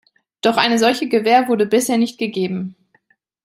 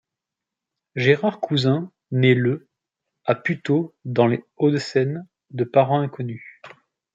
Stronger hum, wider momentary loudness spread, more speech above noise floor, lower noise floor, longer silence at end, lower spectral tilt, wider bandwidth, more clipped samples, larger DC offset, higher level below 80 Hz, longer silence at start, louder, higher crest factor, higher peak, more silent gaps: neither; second, 8 LU vs 13 LU; second, 44 dB vs 65 dB; second, -61 dBFS vs -86 dBFS; first, 0.7 s vs 0.45 s; second, -4 dB/octave vs -7.5 dB/octave; first, 16 kHz vs 7.8 kHz; neither; neither; about the same, -66 dBFS vs -66 dBFS; second, 0.45 s vs 0.95 s; first, -17 LUFS vs -22 LUFS; about the same, 18 dB vs 20 dB; about the same, 0 dBFS vs -2 dBFS; neither